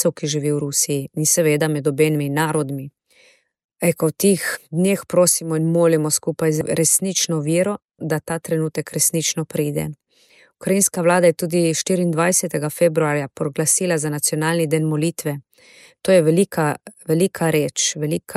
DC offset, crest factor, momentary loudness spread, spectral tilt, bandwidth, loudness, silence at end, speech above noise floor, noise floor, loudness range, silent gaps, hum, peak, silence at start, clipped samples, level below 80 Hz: under 0.1%; 16 dB; 8 LU; -4.5 dB/octave; 15 kHz; -19 LUFS; 0 s; 36 dB; -55 dBFS; 3 LU; 3.64-3.69 s; none; -4 dBFS; 0 s; under 0.1%; -62 dBFS